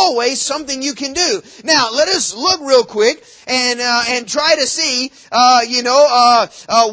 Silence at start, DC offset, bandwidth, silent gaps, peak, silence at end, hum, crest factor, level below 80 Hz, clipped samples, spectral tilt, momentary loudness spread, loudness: 0 s; under 0.1%; 8 kHz; none; 0 dBFS; 0 s; none; 14 dB; -54 dBFS; under 0.1%; -0.5 dB/octave; 8 LU; -13 LUFS